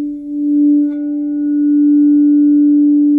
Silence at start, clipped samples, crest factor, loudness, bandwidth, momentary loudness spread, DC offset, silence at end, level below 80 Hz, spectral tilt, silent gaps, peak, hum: 0 s; under 0.1%; 6 dB; -12 LUFS; 1.6 kHz; 9 LU; under 0.1%; 0 s; -56 dBFS; -10.5 dB/octave; none; -6 dBFS; none